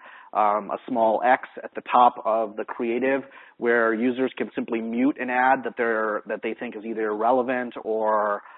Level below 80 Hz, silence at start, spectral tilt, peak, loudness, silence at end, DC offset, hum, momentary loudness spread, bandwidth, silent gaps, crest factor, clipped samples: -74 dBFS; 0.05 s; -9.5 dB/octave; -4 dBFS; -24 LUFS; 0.05 s; under 0.1%; none; 10 LU; 4.1 kHz; none; 20 dB; under 0.1%